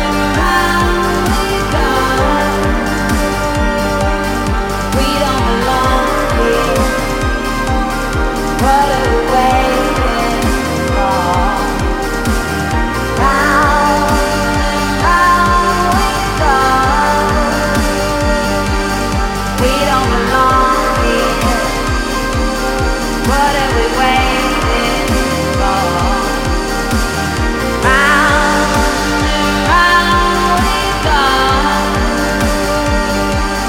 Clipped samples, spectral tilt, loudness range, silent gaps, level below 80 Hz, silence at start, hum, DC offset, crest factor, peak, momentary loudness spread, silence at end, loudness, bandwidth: under 0.1%; -4.5 dB/octave; 3 LU; none; -20 dBFS; 0 s; none; under 0.1%; 12 dB; 0 dBFS; 6 LU; 0 s; -13 LUFS; 17 kHz